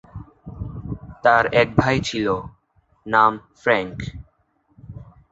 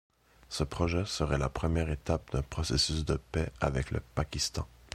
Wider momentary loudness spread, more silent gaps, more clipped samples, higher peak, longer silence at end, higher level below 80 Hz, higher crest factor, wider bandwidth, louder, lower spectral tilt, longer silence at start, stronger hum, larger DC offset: first, 24 LU vs 7 LU; neither; neither; first, -2 dBFS vs -12 dBFS; about the same, 0.3 s vs 0.25 s; about the same, -44 dBFS vs -40 dBFS; about the same, 20 dB vs 22 dB; second, 8.2 kHz vs 14.5 kHz; first, -20 LUFS vs -32 LUFS; about the same, -5.5 dB/octave vs -5 dB/octave; second, 0.15 s vs 0.5 s; neither; neither